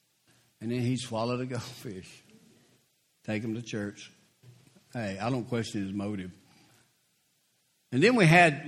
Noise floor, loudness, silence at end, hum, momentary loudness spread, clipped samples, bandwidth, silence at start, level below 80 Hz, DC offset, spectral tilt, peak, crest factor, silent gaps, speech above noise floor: -72 dBFS; -29 LUFS; 0 s; none; 24 LU; under 0.1%; 14 kHz; 0.6 s; -68 dBFS; under 0.1%; -6 dB/octave; -4 dBFS; 26 dB; none; 44 dB